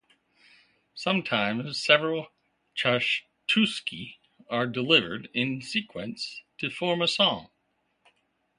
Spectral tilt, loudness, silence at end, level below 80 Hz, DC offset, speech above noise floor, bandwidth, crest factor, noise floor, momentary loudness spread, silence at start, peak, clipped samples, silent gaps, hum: -4.5 dB/octave; -26 LUFS; 1.1 s; -68 dBFS; under 0.1%; 47 dB; 11.5 kHz; 26 dB; -74 dBFS; 15 LU; 0.95 s; -2 dBFS; under 0.1%; none; none